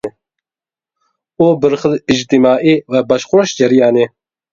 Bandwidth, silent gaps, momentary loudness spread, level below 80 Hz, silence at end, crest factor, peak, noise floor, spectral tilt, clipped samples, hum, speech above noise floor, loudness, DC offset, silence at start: 7.6 kHz; none; 5 LU; -50 dBFS; 0.45 s; 14 dB; 0 dBFS; under -90 dBFS; -5.5 dB/octave; under 0.1%; none; over 79 dB; -12 LUFS; under 0.1%; 0.05 s